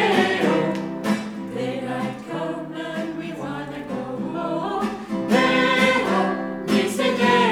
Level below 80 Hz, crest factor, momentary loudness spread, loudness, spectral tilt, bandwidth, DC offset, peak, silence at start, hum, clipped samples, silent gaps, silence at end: -58 dBFS; 18 dB; 13 LU; -23 LUFS; -5 dB/octave; 16.5 kHz; under 0.1%; -4 dBFS; 0 s; none; under 0.1%; none; 0 s